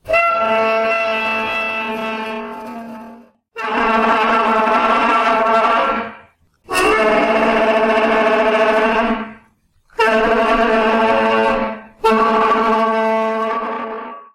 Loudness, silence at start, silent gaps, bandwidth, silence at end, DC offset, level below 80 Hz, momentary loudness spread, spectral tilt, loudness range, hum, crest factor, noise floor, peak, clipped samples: -15 LUFS; 0.05 s; none; 16 kHz; 0.1 s; under 0.1%; -44 dBFS; 13 LU; -4 dB/octave; 4 LU; none; 12 dB; -56 dBFS; -4 dBFS; under 0.1%